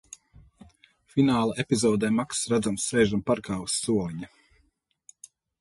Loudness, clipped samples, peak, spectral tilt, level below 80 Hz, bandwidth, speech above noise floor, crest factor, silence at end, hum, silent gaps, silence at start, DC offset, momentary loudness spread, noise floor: -26 LUFS; under 0.1%; -8 dBFS; -4.5 dB/octave; -56 dBFS; 11.5 kHz; 45 dB; 18 dB; 1.35 s; none; none; 1.15 s; under 0.1%; 14 LU; -70 dBFS